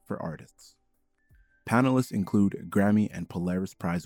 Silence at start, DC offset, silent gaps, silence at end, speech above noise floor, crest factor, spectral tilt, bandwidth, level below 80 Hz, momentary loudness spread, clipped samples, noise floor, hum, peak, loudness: 0.1 s; under 0.1%; none; 0 s; 44 dB; 18 dB; -7.5 dB/octave; 16.5 kHz; -64 dBFS; 13 LU; under 0.1%; -71 dBFS; none; -10 dBFS; -27 LUFS